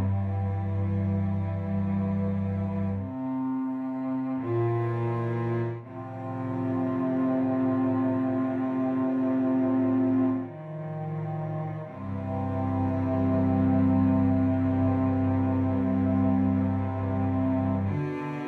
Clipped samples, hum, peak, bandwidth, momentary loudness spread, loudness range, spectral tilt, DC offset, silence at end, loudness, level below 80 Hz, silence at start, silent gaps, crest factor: under 0.1%; none; -14 dBFS; 4.2 kHz; 8 LU; 5 LU; -11 dB/octave; under 0.1%; 0 s; -27 LUFS; -56 dBFS; 0 s; none; 14 dB